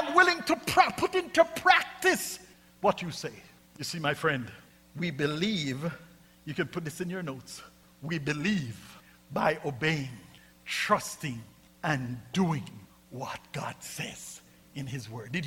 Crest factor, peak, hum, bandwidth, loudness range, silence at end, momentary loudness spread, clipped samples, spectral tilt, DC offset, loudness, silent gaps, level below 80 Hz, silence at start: 24 dB; -6 dBFS; none; 17.5 kHz; 8 LU; 0 s; 20 LU; under 0.1%; -4.5 dB/octave; under 0.1%; -30 LUFS; none; -62 dBFS; 0 s